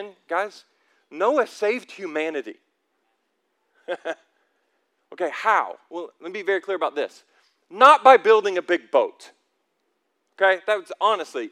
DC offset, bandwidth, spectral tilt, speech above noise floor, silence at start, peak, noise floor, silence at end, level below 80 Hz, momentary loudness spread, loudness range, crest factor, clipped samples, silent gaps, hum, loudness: under 0.1%; 12.5 kHz; -2.5 dB/octave; 52 dB; 0 s; 0 dBFS; -73 dBFS; 0 s; -78 dBFS; 20 LU; 13 LU; 24 dB; under 0.1%; none; none; -21 LUFS